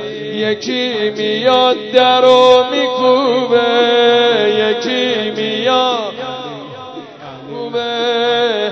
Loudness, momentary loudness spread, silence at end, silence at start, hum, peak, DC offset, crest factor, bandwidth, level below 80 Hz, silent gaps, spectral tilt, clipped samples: -13 LUFS; 18 LU; 0 s; 0 s; none; 0 dBFS; under 0.1%; 14 dB; 8 kHz; -60 dBFS; none; -4 dB/octave; 0.1%